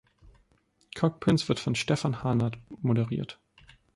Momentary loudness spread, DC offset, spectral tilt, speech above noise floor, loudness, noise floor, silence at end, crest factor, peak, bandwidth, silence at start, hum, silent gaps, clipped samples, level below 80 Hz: 11 LU; under 0.1%; -6 dB/octave; 41 dB; -28 LUFS; -68 dBFS; 0.65 s; 18 dB; -10 dBFS; 11.5 kHz; 0.25 s; none; none; under 0.1%; -58 dBFS